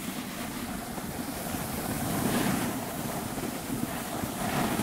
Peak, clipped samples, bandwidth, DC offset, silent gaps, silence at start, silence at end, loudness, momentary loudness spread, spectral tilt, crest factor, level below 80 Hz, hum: -14 dBFS; under 0.1%; 16 kHz; under 0.1%; none; 0 s; 0 s; -32 LUFS; 7 LU; -4.5 dB/octave; 18 dB; -50 dBFS; none